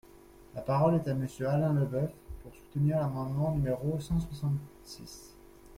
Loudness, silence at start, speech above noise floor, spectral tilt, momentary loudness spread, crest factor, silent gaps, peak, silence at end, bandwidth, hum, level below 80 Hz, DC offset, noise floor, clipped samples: -31 LUFS; 0.4 s; 24 dB; -8.5 dB/octave; 20 LU; 18 dB; none; -14 dBFS; 0 s; 15.5 kHz; none; -50 dBFS; under 0.1%; -55 dBFS; under 0.1%